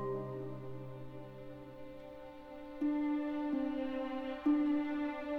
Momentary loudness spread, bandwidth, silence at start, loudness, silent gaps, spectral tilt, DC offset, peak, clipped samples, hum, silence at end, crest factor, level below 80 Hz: 18 LU; 5 kHz; 0 s; -37 LUFS; none; -8.5 dB/octave; under 0.1%; -22 dBFS; under 0.1%; none; 0 s; 16 dB; -64 dBFS